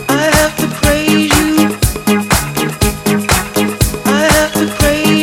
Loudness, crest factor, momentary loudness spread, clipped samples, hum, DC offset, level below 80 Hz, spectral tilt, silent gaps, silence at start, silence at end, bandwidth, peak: -12 LUFS; 12 dB; 5 LU; under 0.1%; none; under 0.1%; -24 dBFS; -4 dB/octave; none; 0 s; 0 s; 18 kHz; 0 dBFS